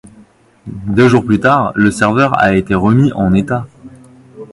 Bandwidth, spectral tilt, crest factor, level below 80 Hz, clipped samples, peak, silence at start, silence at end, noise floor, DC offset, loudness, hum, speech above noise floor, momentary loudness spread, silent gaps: 11.5 kHz; -7 dB/octave; 12 dB; -38 dBFS; under 0.1%; 0 dBFS; 0.65 s; 0.05 s; -45 dBFS; under 0.1%; -12 LUFS; none; 34 dB; 10 LU; none